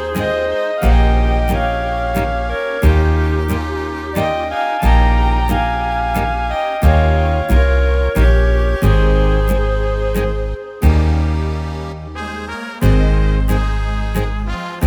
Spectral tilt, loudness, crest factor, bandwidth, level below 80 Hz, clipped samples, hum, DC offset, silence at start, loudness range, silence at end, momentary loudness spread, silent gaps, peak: -7 dB/octave; -16 LUFS; 14 dB; 19.5 kHz; -16 dBFS; under 0.1%; none; under 0.1%; 0 s; 4 LU; 0 s; 9 LU; none; 0 dBFS